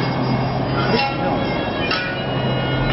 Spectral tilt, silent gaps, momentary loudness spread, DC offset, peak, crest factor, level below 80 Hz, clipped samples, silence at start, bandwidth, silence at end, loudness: -9.5 dB/octave; none; 3 LU; under 0.1%; -6 dBFS; 14 dB; -36 dBFS; under 0.1%; 0 s; 5.8 kHz; 0 s; -20 LUFS